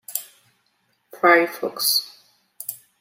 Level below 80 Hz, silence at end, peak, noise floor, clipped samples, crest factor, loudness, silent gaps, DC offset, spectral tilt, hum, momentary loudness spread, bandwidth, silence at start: -80 dBFS; 0.25 s; -2 dBFS; -68 dBFS; under 0.1%; 22 dB; -19 LUFS; none; under 0.1%; -1 dB/octave; none; 17 LU; 16.5 kHz; 0.1 s